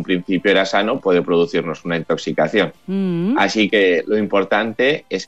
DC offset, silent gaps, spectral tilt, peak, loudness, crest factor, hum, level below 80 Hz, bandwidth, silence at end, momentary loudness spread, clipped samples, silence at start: 0.4%; none; -5.5 dB/octave; -4 dBFS; -17 LUFS; 14 dB; none; -60 dBFS; 8.2 kHz; 0 s; 6 LU; under 0.1%; 0 s